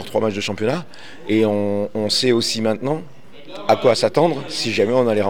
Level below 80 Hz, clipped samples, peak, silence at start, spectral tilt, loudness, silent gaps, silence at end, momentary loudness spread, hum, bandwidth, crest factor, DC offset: -60 dBFS; under 0.1%; -2 dBFS; 0 s; -4.5 dB/octave; -19 LUFS; none; 0 s; 11 LU; none; 17.5 kHz; 16 dB; 2%